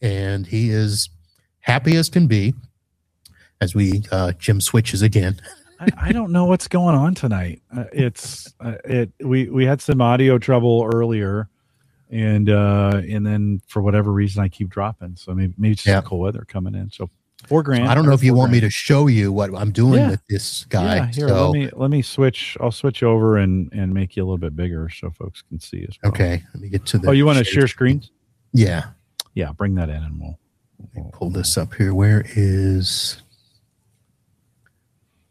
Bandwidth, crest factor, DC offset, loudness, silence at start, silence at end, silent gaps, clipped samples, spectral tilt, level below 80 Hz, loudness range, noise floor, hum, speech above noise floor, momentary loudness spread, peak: 15.5 kHz; 18 dB; under 0.1%; -19 LUFS; 0 s; 2.15 s; none; under 0.1%; -6.5 dB/octave; -40 dBFS; 5 LU; -70 dBFS; none; 53 dB; 15 LU; -2 dBFS